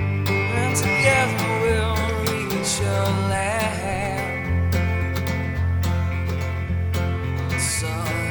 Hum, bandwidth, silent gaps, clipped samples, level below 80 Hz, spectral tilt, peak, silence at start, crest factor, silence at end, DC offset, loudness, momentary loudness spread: none; over 20 kHz; none; under 0.1%; -34 dBFS; -5 dB/octave; -4 dBFS; 0 s; 18 dB; 0 s; under 0.1%; -22 LUFS; 6 LU